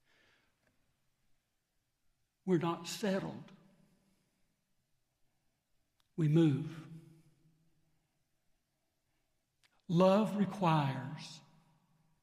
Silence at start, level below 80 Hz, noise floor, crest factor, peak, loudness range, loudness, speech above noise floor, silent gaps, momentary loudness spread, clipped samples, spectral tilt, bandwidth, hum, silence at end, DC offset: 2.45 s; -80 dBFS; -82 dBFS; 22 dB; -16 dBFS; 9 LU; -33 LUFS; 50 dB; none; 20 LU; under 0.1%; -7 dB/octave; 15 kHz; none; 0.85 s; under 0.1%